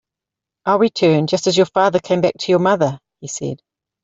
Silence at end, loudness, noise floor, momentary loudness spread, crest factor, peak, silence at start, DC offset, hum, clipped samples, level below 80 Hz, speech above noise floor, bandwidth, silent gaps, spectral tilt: 0.5 s; -17 LUFS; -85 dBFS; 13 LU; 16 dB; -2 dBFS; 0.65 s; under 0.1%; none; under 0.1%; -58 dBFS; 69 dB; 8 kHz; none; -5 dB/octave